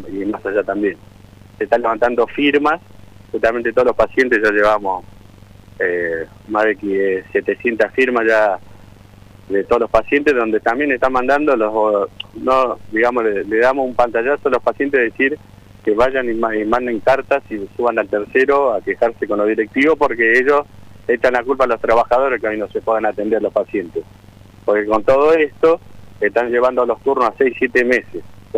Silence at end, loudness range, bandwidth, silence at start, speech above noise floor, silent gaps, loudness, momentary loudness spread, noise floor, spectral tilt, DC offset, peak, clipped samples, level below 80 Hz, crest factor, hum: 0 s; 3 LU; 11.5 kHz; 0 s; 26 dB; none; -16 LUFS; 8 LU; -42 dBFS; -6 dB/octave; under 0.1%; -2 dBFS; under 0.1%; -44 dBFS; 16 dB; none